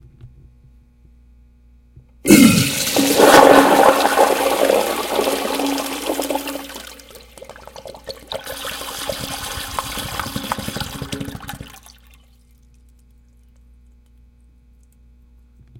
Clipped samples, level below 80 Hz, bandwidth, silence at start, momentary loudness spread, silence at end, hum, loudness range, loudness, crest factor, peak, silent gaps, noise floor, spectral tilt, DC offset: under 0.1%; -46 dBFS; 17 kHz; 0.25 s; 24 LU; 0 s; 60 Hz at -50 dBFS; 17 LU; -16 LUFS; 20 dB; 0 dBFS; none; -50 dBFS; -3.5 dB/octave; under 0.1%